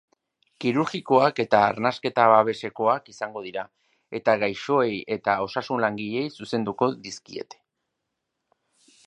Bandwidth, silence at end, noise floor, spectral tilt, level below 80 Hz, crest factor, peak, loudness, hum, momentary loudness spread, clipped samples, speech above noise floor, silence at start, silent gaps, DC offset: 10.5 kHz; 1.65 s; -81 dBFS; -5.5 dB/octave; -68 dBFS; 22 dB; -2 dBFS; -24 LUFS; none; 16 LU; under 0.1%; 57 dB; 0.6 s; none; under 0.1%